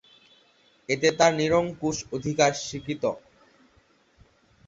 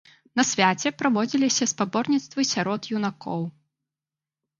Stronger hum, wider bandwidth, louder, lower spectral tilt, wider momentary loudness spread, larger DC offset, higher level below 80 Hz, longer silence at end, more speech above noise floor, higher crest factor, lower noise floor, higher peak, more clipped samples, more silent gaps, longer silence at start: neither; second, 8 kHz vs 9.4 kHz; about the same, -25 LUFS vs -24 LUFS; about the same, -4 dB/octave vs -3.5 dB/octave; about the same, 12 LU vs 10 LU; neither; first, -58 dBFS vs -70 dBFS; first, 1.5 s vs 1.1 s; second, 38 dB vs over 66 dB; about the same, 22 dB vs 22 dB; second, -62 dBFS vs under -90 dBFS; about the same, -6 dBFS vs -4 dBFS; neither; neither; first, 0.9 s vs 0.35 s